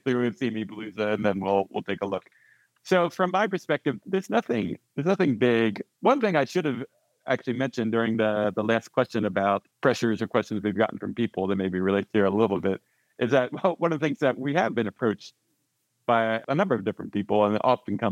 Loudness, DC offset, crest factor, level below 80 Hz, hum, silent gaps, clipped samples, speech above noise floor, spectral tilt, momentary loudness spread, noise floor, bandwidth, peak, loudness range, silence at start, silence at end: -26 LUFS; under 0.1%; 20 dB; -72 dBFS; none; none; under 0.1%; 49 dB; -6.5 dB/octave; 7 LU; -75 dBFS; 13.5 kHz; -6 dBFS; 2 LU; 0.05 s; 0 s